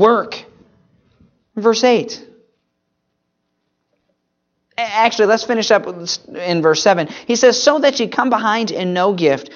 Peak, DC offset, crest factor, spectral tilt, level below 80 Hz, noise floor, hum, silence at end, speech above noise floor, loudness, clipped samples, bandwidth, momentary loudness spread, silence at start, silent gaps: 0 dBFS; under 0.1%; 16 dB; -3.5 dB/octave; -64 dBFS; -71 dBFS; none; 0 s; 56 dB; -15 LUFS; under 0.1%; 7.4 kHz; 11 LU; 0 s; none